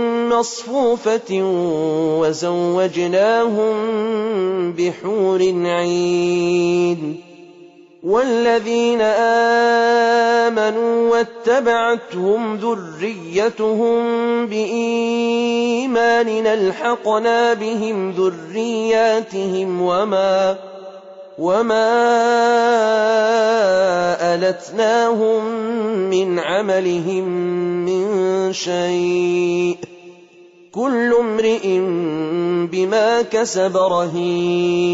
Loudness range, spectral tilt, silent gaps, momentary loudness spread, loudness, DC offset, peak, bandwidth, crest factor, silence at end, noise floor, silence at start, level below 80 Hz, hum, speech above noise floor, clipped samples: 4 LU; -5 dB/octave; none; 6 LU; -17 LUFS; under 0.1%; -6 dBFS; 8 kHz; 12 dB; 0 s; -46 dBFS; 0 s; -62 dBFS; none; 29 dB; under 0.1%